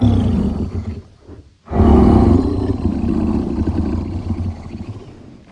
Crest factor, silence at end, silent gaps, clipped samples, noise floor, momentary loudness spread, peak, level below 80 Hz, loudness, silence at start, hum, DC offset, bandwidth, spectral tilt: 14 dB; 0.15 s; none; under 0.1%; -40 dBFS; 19 LU; -2 dBFS; -24 dBFS; -17 LUFS; 0 s; none; under 0.1%; 9.4 kHz; -9.5 dB/octave